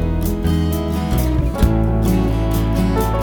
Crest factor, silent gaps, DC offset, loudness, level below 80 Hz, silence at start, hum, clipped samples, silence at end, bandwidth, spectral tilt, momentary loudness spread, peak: 14 dB; none; under 0.1%; -18 LUFS; -20 dBFS; 0 s; none; under 0.1%; 0 s; over 20 kHz; -7 dB/octave; 3 LU; -2 dBFS